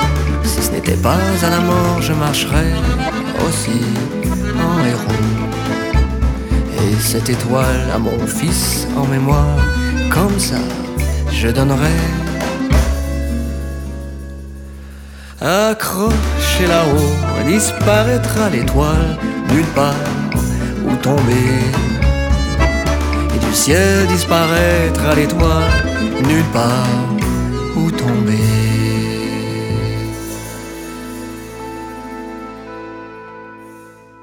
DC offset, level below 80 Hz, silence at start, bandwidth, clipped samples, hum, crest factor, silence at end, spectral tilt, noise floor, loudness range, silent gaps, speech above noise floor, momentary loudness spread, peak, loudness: under 0.1%; -22 dBFS; 0 s; 19 kHz; under 0.1%; none; 14 dB; 0.3 s; -5.5 dB/octave; -39 dBFS; 7 LU; none; 25 dB; 15 LU; 0 dBFS; -15 LUFS